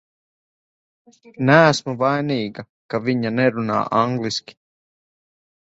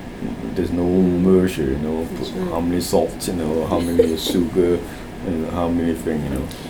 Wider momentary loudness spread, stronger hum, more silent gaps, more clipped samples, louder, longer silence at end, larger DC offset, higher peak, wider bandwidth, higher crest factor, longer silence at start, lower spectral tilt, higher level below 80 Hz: first, 14 LU vs 9 LU; neither; first, 2.69-2.89 s vs none; neither; about the same, -19 LUFS vs -20 LUFS; first, 1.35 s vs 0 s; neither; about the same, 0 dBFS vs -2 dBFS; second, 8 kHz vs over 20 kHz; about the same, 22 dB vs 18 dB; first, 1.4 s vs 0 s; about the same, -5.5 dB/octave vs -6.5 dB/octave; second, -60 dBFS vs -38 dBFS